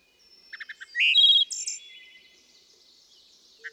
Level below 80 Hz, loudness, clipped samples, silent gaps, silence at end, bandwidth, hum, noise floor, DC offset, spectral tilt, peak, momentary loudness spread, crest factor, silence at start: -84 dBFS; -19 LUFS; under 0.1%; none; 0.05 s; 15.5 kHz; none; -58 dBFS; under 0.1%; 6 dB/octave; -10 dBFS; 26 LU; 18 dB; 0.55 s